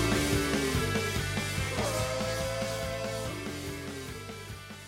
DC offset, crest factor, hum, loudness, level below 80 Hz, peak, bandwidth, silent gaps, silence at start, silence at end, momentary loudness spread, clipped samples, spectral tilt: under 0.1%; 16 dB; none; -32 LUFS; -44 dBFS; -16 dBFS; 16.5 kHz; none; 0 s; 0 s; 12 LU; under 0.1%; -4 dB/octave